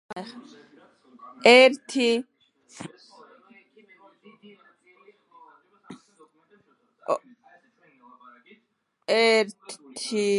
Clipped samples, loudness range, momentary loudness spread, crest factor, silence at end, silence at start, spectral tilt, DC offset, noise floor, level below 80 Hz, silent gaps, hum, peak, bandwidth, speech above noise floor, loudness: under 0.1%; 16 LU; 27 LU; 26 dB; 0 s; 0.1 s; -3 dB/octave; under 0.1%; -73 dBFS; -82 dBFS; none; none; 0 dBFS; 11.5 kHz; 51 dB; -21 LUFS